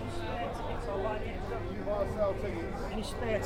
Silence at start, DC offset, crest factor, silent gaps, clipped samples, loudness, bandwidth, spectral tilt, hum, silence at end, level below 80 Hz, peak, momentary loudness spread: 0 s; under 0.1%; 14 dB; none; under 0.1%; -35 LUFS; 16 kHz; -6.5 dB/octave; none; 0 s; -42 dBFS; -18 dBFS; 5 LU